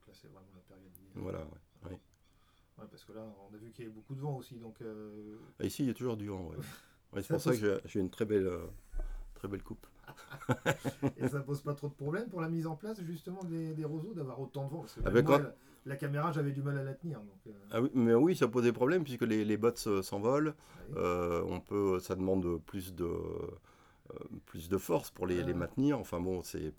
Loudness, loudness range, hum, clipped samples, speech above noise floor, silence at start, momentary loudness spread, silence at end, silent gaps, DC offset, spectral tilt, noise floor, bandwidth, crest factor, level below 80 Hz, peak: -35 LUFS; 16 LU; none; under 0.1%; 33 dB; 0.05 s; 20 LU; 0.05 s; none; under 0.1%; -7 dB/octave; -68 dBFS; over 20 kHz; 22 dB; -54 dBFS; -12 dBFS